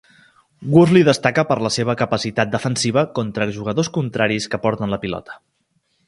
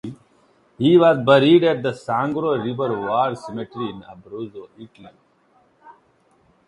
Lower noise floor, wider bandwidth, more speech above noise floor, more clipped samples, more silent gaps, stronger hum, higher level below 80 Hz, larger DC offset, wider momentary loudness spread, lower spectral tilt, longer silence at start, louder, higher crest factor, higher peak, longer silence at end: first, -66 dBFS vs -60 dBFS; about the same, 11.5 kHz vs 10.5 kHz; first, 48 dB vs 41 dB; neither; neither; neither; first, -52 dBFS vs -62 dBFS; neither; second, 10 LU vs 21 LU; second, -5.5 dB/octave vs -7.5 dB/octave; first, 0.6 s vs 0.05 s; about the same, -18 LUFS vs -18 LUFS; about the same, 18 dB vs 20 dB; about the same, 0 dBFS vs 0 dBFS; about the same, 0.7 s vs 0.75 s